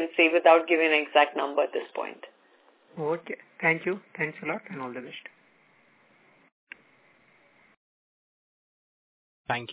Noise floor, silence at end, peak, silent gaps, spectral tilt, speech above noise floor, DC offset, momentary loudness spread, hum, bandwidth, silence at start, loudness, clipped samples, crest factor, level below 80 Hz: -62 dBFS; 0 s; -4 dBFS; 6.52-6.67 s, 7.77-9.45 s; -8 dB/octave; 36 dB; under 0.1%; 20 LU; none; 4 kHz; 0 s; -25 LUFS; under 0.1%; 24 dB; -80 dBFS